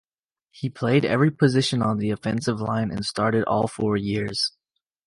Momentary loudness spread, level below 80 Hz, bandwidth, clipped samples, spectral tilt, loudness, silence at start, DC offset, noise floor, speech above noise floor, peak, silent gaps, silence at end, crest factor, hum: 7 LU; -54 dBFS; 11.5 kHz; under 0.1%; -6 dB/octave; -23 LUFS; 0.55 s; under 0.1%; -78 dBFS; 55 dB; -6 dBFS; none; 0.55 s; 18 dB; none